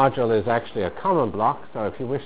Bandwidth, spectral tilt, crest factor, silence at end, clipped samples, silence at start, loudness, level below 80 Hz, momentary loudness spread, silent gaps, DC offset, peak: 4 kHz; -11 dB/octave; 18 dB; 0 s; under 0.1%; 0 s; -23 LUFS; -50 dBFS; 8 LU; none; 1%; -4 dBFS